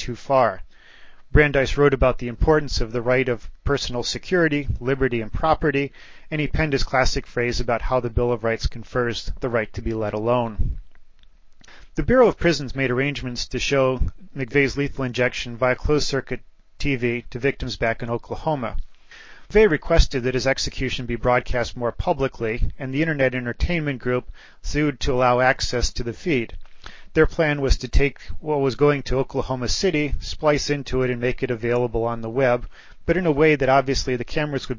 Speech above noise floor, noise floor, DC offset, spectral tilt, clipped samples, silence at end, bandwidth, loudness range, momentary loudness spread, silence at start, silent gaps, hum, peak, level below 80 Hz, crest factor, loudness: 25 dB; -46 dBFS; under 0.1%; -5.5 dB/octave; under 0.1%; 0 s; 7.6 kHz; 3 LU; 9 LU; 0 s; none; none; 0 dBFS; -32 dBFS; 20 dB; -22 LUFS